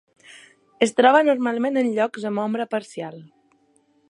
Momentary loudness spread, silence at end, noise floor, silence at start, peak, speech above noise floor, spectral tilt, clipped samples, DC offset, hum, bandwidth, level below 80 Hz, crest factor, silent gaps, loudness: 16 LU; 0.85 s; -62 dBFS; 0.35 s; -2 dBFS; 41 dB; -4.5 dB/octave; under 0.1%; under 0.1%; none; 11.5 kHz; -76 dBFS; 20 dB; none; -21 LUFS